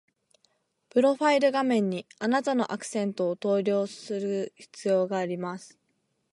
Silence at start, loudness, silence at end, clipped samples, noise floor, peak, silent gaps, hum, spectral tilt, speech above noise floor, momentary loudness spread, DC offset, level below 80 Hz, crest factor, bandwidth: 0.95 s; -27 LUFS; 0.65 s; under 0.1%; -75 dBFS; -10 dBFS; none; none; -5.5 dB/octave; 48 dB; 10 LU; under 0.1%; -80 dBFS; 18 dB; 11.5 kHz